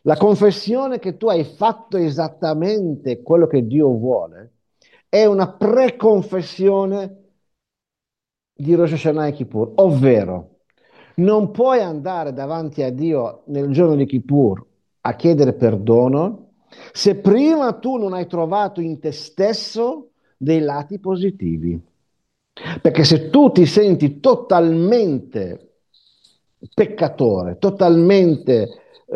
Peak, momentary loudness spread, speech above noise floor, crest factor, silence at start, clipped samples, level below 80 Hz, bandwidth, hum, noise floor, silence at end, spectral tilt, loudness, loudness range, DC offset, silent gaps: 0 dBFS; 13 LU; 71 dB; 16 dB; 0.05 s; under 0.1%; -58 dBFS; 9.4 kHz; none; -88 dBFS; 0 s; -7.5 dB/octave; -17 LUFS; 6 LU; under 0.1%; none